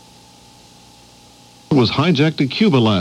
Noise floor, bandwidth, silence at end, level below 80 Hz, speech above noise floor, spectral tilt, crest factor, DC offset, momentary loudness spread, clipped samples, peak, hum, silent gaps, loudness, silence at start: -46 dBFS; 12 kHz; 0 s; -52 dBFS; 31 dB; -7 dB/octave; 14 dB; under 0.1%; 3 LU; under 0.1%; -4 dBFS; 60 Hz at -40 dBFS; none; -16 LUFS; 1.7 s